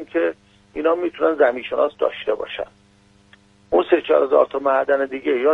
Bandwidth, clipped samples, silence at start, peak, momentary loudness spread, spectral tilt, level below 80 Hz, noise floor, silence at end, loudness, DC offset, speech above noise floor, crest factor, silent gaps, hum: 6 kHz; under 0.1%; 0 s; -2 dBFS; 9 LU; -6 dB/octave; -58 dBFS; -54 dBFS; 0 s; -20 LUFS; under 0.1%; 35 dB; 18 dB; none; none